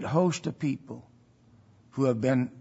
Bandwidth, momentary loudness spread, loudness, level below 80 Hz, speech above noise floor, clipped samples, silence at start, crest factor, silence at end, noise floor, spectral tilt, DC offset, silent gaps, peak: 8 kHz; 17 LU; -28 LUFS; -68 dBFS; 32 dB; under 0.1%; 0 s; 18 dB; 0 s; -59 dBFS; -7 dB/octave; under 0.1%; none; -10 dBFS